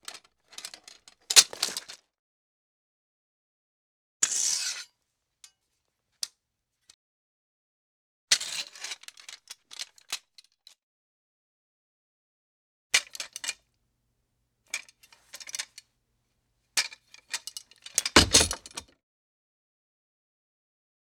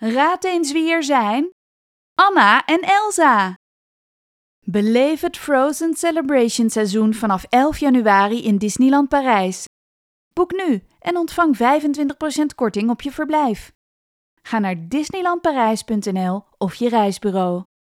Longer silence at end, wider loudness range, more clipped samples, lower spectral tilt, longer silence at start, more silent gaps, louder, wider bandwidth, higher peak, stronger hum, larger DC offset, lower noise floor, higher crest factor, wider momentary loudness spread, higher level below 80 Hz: first, 2.25 s vs 0.2 s; first, 16 LU vs 5 LU; neither; second, -0.5 dB/octave vs -4.5 dB/octave; about the same, 0.1 s vs 0 s; first, 2.19-4.20 s, 6.94-8.28 s, 10.83-12.90 s vs 1.52-2.16 s, 3.56-4.62 s, 9.67-10.31 s, 13.75-14.37 s; second, -26 LUFS vs -18 LUFS; first, 19.5 kHz vs 16 kHz; about the same, 0 dBFS vs 0 dBFS; neither; neither; second, -81 dBFS vs under -90 dBFS; first, 32 dB vs 18 dB; first, 26 LU vs 9 LU; about the same, -54 dBFS vs -52 dBFS